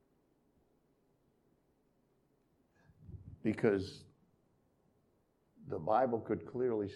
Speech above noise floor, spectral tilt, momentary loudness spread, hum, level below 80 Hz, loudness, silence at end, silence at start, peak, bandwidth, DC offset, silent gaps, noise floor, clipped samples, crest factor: 41 dB; -8 dB/octave; 22 LU; none; -70 dBFS; -36 LUFS; 0 s; 3 s; -16 dBFS; 11 kHz; under 0.1%; none; -75 dBFS; under 0.1%; 24 dB